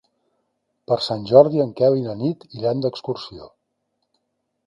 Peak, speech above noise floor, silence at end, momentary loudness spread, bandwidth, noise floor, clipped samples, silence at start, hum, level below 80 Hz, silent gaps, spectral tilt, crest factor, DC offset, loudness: 0 dBFS; 55 dB; 1.2 s; 15 LU; 10.5 kHz; -74 dBFS; under 0.1%; 0.9 s; none; -62 dBFS; none; -8 dB/octave; 22 dB; under 0.1%; -20 LUFS